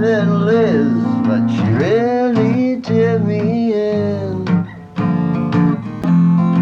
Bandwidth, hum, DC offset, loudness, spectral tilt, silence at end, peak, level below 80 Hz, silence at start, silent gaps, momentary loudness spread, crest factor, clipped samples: 6.6 kHz; none; under 0.1%; -16 LUFS; -9 dB/octave; 0 s; -4 dBFS; -50 dBFS; 0 s; none; 5 LU; 10 dB; under 0.1%